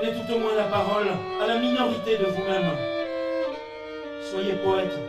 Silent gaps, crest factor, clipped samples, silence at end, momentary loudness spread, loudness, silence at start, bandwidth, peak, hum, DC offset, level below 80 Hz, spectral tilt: none; 16 dB; under 0.1%; 0 s; 10 LU; -26 LUFS; 0 s; 14.5 kHz; -10 dBFS; none; under 0.1%; -58 dBFS; -6 dB/octave